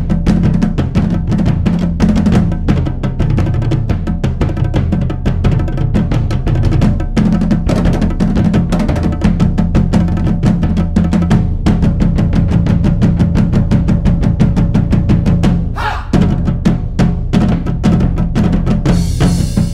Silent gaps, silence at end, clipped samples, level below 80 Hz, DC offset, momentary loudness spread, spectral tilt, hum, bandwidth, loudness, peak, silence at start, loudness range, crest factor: none; 0 s; under 0.1%; -18 dBFS; under 0.1%; 3 LU; -8 dB/octave; none; 11 kHz; -13 LUFS; 0 dBFS; 0 s; 2 LU; 12 dB